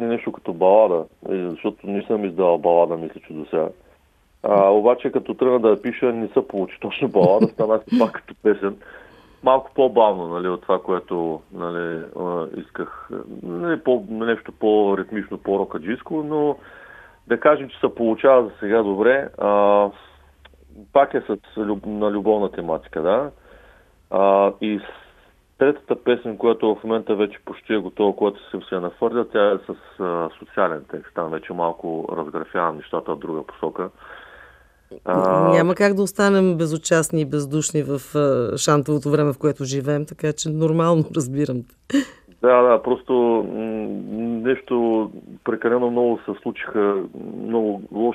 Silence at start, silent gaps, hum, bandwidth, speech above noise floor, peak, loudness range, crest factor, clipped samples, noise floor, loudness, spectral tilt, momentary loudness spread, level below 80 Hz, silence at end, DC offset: 0 s; none; none; 14 kHz; 38 dB; -2 dBFS; 6 LU; 20 dB; under 0.1%; -58 dBFS; -21 LUFS; -6 dB/octave; 12 LU; -58 dBFS; 0 s; under 0.1%